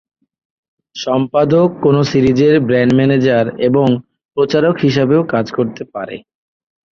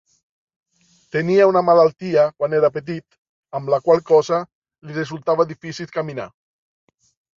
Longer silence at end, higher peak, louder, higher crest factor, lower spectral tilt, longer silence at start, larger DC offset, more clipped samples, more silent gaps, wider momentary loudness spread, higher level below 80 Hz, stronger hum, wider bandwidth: second, 0.75 s vs 1.1 s; about the same, -2 dBFS vs -2 dBFS; first, -13 LUFS vs -18 LUFS; about the same, 14 dB vs 18 dB; about the same, -7.5 dB/octave vs -6.5 dB/octave; second, 0.95 s vs 1.15 s; neither; neither; second, 4.25-4.29 s vs 3.18-3.43 s, 4.55-4.62 s; about the same, 14 LU vs 16 LU; first, -48 dBFS vs -64 dBFS; neither; about the same, 7.2 kHz vs 7.4 kHz